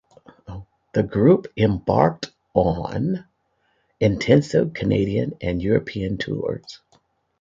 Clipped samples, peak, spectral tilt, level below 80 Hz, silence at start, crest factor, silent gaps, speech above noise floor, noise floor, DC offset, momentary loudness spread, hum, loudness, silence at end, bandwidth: under 0.1%; -2 dBFS; -7.5 dB/octave; -44 dBFS; 0.5 s; 20 dB; none; 48 dB; -68 dBFS; under 0.1%; 17 LU; none; -21 LUFS; 0.65 s; 7.8 kHz